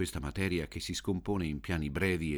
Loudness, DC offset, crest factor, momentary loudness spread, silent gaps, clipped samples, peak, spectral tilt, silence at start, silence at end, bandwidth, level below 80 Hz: -34 LUFS; under 0.1%; 18 dB; 4 LU; none; under 0.1%; -16 dBFS; -5.5 dB/octave; 0 s; 0 s; over 20 kHz; -46 dBFS